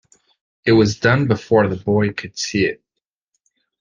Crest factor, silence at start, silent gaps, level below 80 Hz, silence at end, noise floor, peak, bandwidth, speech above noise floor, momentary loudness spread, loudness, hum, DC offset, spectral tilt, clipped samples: 18 dB; 0.65 s; none; -50 dBFS; 1.05 s; -81 dBFS; -2 dBFS; 9.6 kHz; 65 dB; 9 LU; -18 LUFS; none; under 0.1%; -6 dB/octave; under 0.1%